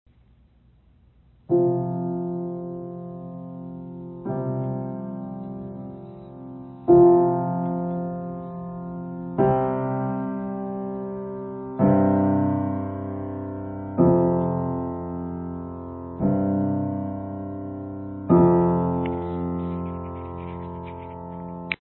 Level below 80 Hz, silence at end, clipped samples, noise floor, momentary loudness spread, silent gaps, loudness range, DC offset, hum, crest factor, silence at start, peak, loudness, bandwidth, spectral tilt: -46 dBFS; 0.05 s; under 0.1%; -57 dBFS; 18 LU; none; 9 LU; under 0.1%; none; 18 dB; 1.5 s; -6 dBFS; -25 LUFS; 4.2 kHz; -13 dB/octave